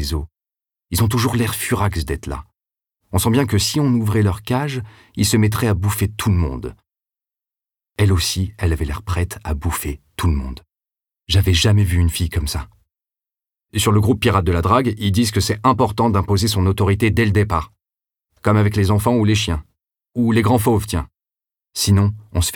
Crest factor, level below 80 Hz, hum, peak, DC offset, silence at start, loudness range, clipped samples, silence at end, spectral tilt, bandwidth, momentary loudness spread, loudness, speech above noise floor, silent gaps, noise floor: 18 dB; -32 dBFS; none; -2 dBFS; under 0.1%; 0 s; 5 LU; under 0.1%; 0 s; -5.5 dB/octave; 18.5 kHz; 11 LU; -18 LUFS; over 73 dB; none; under -90 dBFS